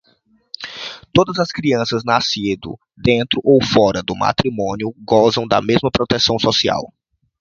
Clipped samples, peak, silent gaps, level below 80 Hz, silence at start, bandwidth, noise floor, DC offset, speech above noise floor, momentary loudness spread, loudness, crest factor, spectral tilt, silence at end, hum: under 0.1%; 0 dBFS; none; -44 dBFS; 0.6 s; 7.6 kHz; -58 dBFS; under 0.1%; 42 dB; 14 LU; -16 LUFS; 18 dB; -5 dB/octave; 0.55 s; none